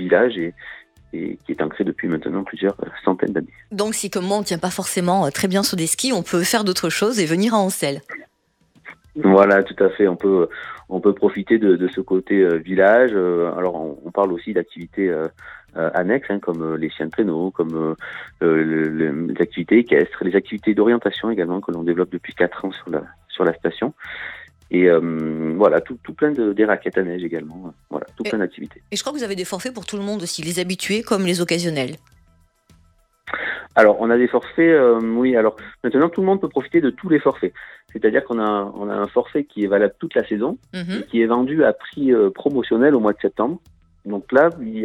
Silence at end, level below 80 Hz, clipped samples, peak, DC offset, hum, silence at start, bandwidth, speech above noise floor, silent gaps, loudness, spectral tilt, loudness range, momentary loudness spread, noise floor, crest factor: 0 s; -58 dBFS; under 0.1%; 0 dBFS; under 0.1%; none; 0 s; 16.5 kHz; 44 dB; none; -19 LUFS; -5 dB/octave; 6 LU; 13 LU; -63 dBFS; 18 dB